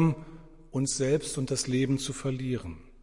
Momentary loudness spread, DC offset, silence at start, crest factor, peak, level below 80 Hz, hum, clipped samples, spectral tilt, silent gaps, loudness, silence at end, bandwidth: 10 LU; under 0.1%; 0 s; 16 dB; -14 dBFS; -52 dBFS; none; under 0.1%; -5 dB/octave; none; -30 LUFS; 0 s; 11.5 kHz